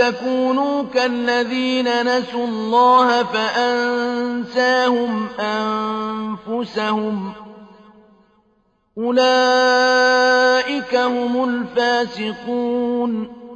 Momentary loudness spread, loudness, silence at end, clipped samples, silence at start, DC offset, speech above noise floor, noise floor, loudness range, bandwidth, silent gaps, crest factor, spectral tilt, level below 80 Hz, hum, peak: 10 LU; -18 LUFS; 0 s; under 0.1%; 0 s; under 0.1%; 44 dB; -62 dBFS; 8 LU; 8.6 kHz; none; 14 dB; -4 dB/octave; -60 dBFS; none; -4 dBFS